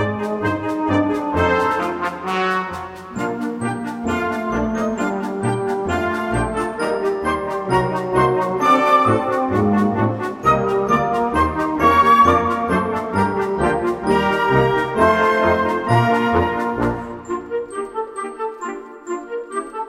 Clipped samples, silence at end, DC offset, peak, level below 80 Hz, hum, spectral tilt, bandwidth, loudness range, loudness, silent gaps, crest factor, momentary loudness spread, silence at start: under 0.1%; 0 s; under 0.1%; -2 dBFS; -40 dBFS; none; -6.5 dB/octave; 16 kHz; 6 LU; -19 LUFS; none; 16 dB; 12 LU; 0 s